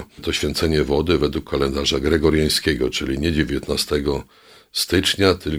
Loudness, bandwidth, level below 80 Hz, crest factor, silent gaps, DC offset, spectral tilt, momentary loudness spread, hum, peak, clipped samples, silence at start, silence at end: -20 LUFS; 20 kHz; -34 dBFS; 20 dB; none; under 0.1%; -4.5 dB/octave; 6 LU; none; 0 dBFS; under 0.1%; 0 s; 0 s